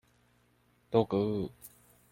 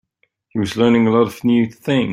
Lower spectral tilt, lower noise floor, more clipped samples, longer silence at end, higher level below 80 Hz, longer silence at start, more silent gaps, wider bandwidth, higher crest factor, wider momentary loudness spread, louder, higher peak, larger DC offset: about the same, -8 dB/octave vs -7 dB/octave; first, -69 dBFS vs -64 dBFS; neither; first, 0.45 s vs 0 s; second, -64 dBFS vs -54 dBFS; first, 0.9 s vs 0.55 s; neither; first, 16.5 kHz vs 14 kHz; first, 24 dB vs 14 dB; first, 24 LU vs 9 LU; second, -32 LUFS vs -17 LUFS; second, -12 dBFS vs -2 dBFS; neither